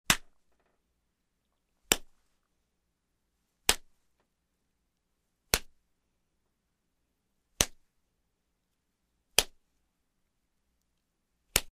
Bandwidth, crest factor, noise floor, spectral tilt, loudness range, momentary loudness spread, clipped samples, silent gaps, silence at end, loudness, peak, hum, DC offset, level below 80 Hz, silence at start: 15.5 kHz; 34 dB; -80 dBFS; -0.5 dB/octave; 4 LU; 3 LU; under 0.1%; none; 0.1 s; -30 LUFS; -4 dBFS; none; under 0.1%; -52 dBFS; 0.1 s